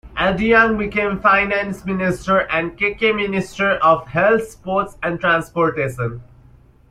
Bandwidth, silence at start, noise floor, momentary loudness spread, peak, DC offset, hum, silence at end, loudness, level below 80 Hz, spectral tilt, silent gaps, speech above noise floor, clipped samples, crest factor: 15 kHz; 0.05 s; -48 dBFS; 8 LU; -2 dBFS; under 0.1%; none; 0.7 s; -18 LUFS; -42 dBFS; -6 dB/octave; none; 30 dB; under 0.1%; 16 dB